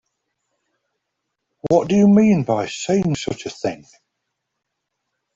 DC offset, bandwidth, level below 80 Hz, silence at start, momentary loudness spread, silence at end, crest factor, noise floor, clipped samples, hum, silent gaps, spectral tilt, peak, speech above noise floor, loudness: under 0.1%; 7.8 kHz; -56 dBFS; 1.65 s; 14 LU; 1.6 s; 18 dB; -78 dBFS; under 0.1%; none; none; -6.5 dB/octave; -2 dBFS; 61 dB; -18 LUFS